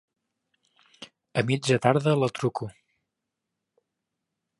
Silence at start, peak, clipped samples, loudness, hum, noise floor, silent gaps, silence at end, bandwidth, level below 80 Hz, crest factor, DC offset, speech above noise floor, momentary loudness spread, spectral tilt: 1 s; -6 dBFS; under 0.1%; -25 LUFS; none; -84 dBFS; none; 1.9 s; 11.5 kHz; -66 dBFS; 24 dB; under 0.1%; 60 dB; 11 LU; -6 dB/octave